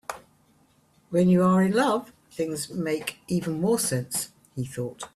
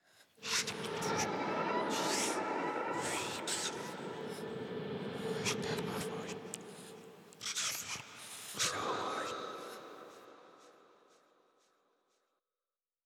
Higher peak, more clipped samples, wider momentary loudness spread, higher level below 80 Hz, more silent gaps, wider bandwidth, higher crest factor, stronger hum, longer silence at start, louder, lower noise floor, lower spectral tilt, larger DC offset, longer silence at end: first, -10 dBFS vs -20 dBFS; neither; about the same, 16 LU vs 16 LU; first, -62 dBFS vs -76 dBFS; neither; second, 14.5 kHz vs 18.5 kHz; about the same, 16 dB vs 20 dB; neither; about the same, 0.1 s vs 0.2 s; first, -25 LUFS vs -38 LUFS; second, -62 dBFS vs under -90 dBFS; first, -5.5 dB/octave vs -2.5 dB/octave; neither; second, 0.1 s vs 2.2 s